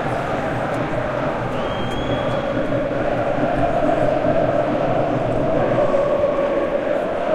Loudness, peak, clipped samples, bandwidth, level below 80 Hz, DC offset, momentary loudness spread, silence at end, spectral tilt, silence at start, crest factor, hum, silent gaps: -20 LUFS; -6 dBFS; under 0.1%; 11 kHz; -36 dBFS; under 0.1%; 4 LU; 0 s; -7.5 dB/octave; 0 s; 14 dB; none; none